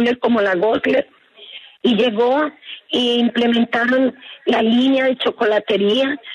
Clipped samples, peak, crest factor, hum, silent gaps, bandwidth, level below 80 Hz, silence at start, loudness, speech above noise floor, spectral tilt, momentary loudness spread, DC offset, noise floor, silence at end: under 0.1%; -4 dBFS; 12 dB; none; none; 9.4 kHz; -62 dBFS; 0 s; -17 LUFS; 24 dB; -5.5 dB/octave; 9 LU; under 0.1%; -40 dBFS; 0 s